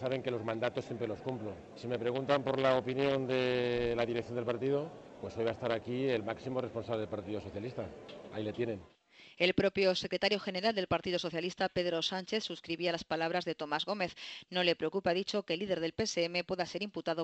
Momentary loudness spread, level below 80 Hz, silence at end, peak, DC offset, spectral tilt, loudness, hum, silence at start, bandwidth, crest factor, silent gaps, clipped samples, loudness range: 10 LU; -64 dBFS; 0 s; -14 dBFS; under 0.1%; -5 dB/octave; -34 LUFS; none; 0 s; 8.4 kHz; 22 dB; none; under 0.1%; 5 LU